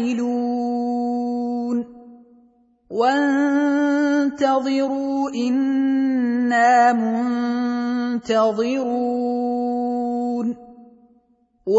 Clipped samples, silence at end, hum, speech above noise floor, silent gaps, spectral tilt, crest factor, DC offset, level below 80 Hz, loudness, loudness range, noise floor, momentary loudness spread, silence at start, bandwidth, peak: under 0.1%; 0 s; none; 42 dB; none; -5 dB/octave; 16 dB; under 0.1%; -66 dBFS; -20 LUFS; 4 LU; -61 dBFS; 7 LU; 0 s; 8 kHz; -4 dBFS